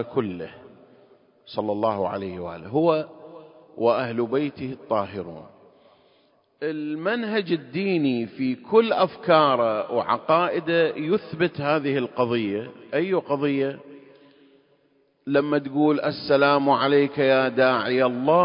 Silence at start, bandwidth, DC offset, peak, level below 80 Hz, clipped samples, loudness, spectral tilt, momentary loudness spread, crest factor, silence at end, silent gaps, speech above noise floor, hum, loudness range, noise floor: 0 s; 5.4 kHz; under 0.1%; -4 dBFS; -64 dBFS; under 0.1%; -23 LUFS; -10.5 dB/octave; 13 LU; 20 dB; 0 s; none; 42 dB; none; 7 LU; -64 dBFS